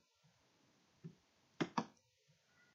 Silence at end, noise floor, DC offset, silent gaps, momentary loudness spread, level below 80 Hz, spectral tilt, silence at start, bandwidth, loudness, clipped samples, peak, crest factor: 0.85 s; -76 dBFS; under 0.1%; none; 17 LU; under -90 dBFS; -4.5 dB/octave; 1.05 s; 7.6 kHz; -45 LUFS; under 0.1%; -22 dBFS; 28 dB